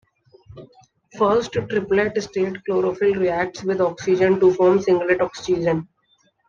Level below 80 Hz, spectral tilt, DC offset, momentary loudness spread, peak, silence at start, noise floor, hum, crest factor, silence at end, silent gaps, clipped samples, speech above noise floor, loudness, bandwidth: -54 dBFS; -6.5 dB/octave; under 0.1%; 8 LU; -6 dBFS; 0.5 s; -63 dBFS; none; 16 dB; 0.65 s; none; under 0.1%; 44 dB; -20 LUFS; 7.4 kHz